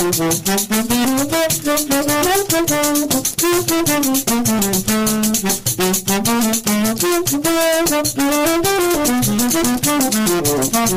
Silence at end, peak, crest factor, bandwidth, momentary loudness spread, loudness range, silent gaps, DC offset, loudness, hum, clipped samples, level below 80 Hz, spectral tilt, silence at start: 0 s; -2 dBFS; 14 dB; 16 kHz; 2 LU; 1 LU; none; under 0.1%; -15 LUFS; none; under 0.1%; -42 dBFS; -3 dB/octave; 0 s